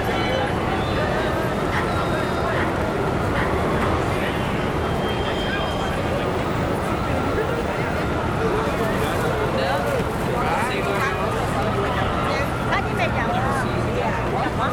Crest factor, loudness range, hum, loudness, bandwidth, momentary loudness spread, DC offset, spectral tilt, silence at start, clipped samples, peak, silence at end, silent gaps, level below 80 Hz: 14 dB; 1 LU; none; -22 LUFS; 19.5 kHz; 2 LU; under 0.1%; -6 dB/octave; 0 s; under 0.1%; -8 dBFS; 0 s; none; -34 dBFS